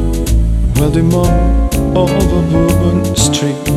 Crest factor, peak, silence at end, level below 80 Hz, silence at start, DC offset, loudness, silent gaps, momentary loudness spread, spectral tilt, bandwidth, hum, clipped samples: 10 dB; 0 dBFS; 0 s; -16 dBFS; 0 s; under 0.1%; -12 LUFS; none; 3 LU; -6 dB/octave; 15 kHz; none; under 0.1%